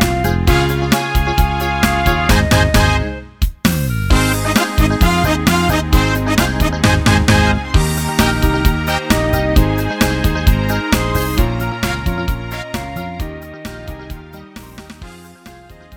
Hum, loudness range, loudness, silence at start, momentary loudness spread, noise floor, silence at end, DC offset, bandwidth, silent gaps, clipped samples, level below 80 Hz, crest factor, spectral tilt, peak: none; 10 LU; -15 LUFS; 0 s; 17 LU; -39 dBFS; 0 s; under 0.1%; 18.5 kHz; none; under 0.1%; -20 dBFS; 14 dB; -5 dB/octave; 0 dBFS